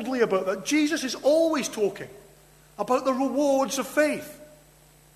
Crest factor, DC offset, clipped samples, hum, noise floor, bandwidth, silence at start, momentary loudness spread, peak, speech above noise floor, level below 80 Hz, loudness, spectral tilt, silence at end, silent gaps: 16 dB; under 0.1%; under 0.1%; none; -55 dBFS; 13.5 kHz; 0 s; 12 LU; -10 dBFS; 31 dB; -64 dBFS; -25 LUFS; -3.5 dB/octave; 0.7 s; none